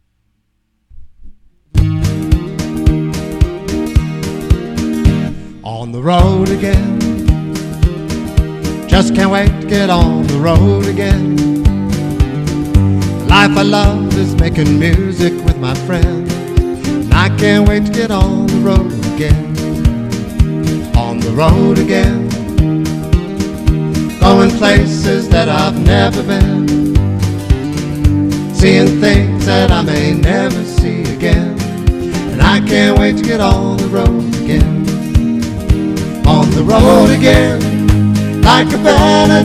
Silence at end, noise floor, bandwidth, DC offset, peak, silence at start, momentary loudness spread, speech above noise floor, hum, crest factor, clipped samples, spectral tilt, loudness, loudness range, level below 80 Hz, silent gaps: 0 s; -62 dBFS; 15 kHz; under 0.1%; 0 dBFS; 0.95 s; 8 LU; 53 dB; none; 12 dB; 0.6%; -6.5 dB/octave; -12 LUFS; 4 LU; -18 dBFS; none